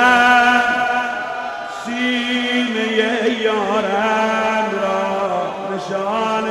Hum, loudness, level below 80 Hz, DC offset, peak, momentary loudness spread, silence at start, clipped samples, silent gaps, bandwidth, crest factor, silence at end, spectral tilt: none; -17 LUFS; -56 dBFS; under 0.1%; 0 dBFS; 11 LU; 0 s; under 0.1%; none; 13.5 kHz; 16 dB; 0 s; -3.5 dB/octave